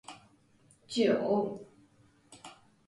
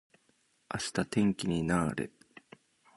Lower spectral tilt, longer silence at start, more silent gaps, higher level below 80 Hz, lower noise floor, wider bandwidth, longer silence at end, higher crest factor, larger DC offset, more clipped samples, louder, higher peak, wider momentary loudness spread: about the same, -5.5 dB/octave vs -5.5 dB/octave; second, 0.1 s vs 0.7 s; neither; second, -74 dBFS vs -58 dBFS; second, -65 dBFS vs -72 dBFS; about the same, 11.5 kHz vs 11.5 kHz; second, 0.35 s vs 0.9 s; about the same, 20 dB vs 22 dB; neither; neither; about the same, -30 LUFS vs -32 LUFS; about the same, -16 dBFS vs -14 dBFS; first, 24 LU vs 11 LU